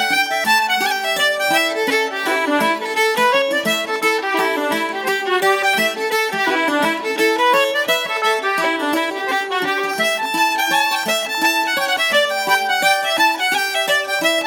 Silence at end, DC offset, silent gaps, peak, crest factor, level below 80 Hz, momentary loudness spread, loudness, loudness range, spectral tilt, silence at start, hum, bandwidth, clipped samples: 0 s; under 0.1%; none; -4 dBFS; 14 dB; -72 dBFS; 4 LU; -17 LUFS; 2 LU; -1.5 dB/octave; 0 s; none; 19 kHz; under 0.1%